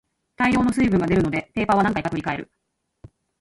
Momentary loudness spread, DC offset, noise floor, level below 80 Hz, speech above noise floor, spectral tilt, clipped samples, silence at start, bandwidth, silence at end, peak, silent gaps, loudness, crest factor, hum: 8 LU; under 0.1%; -50 dBFS; -44 dBFS; 29 dB; -7 dB/octave; under 0.1%; 0.4 s; 11.5 kHz; 0.95 s; -6 dBFS; none; -21 LUFS; 16 dB; none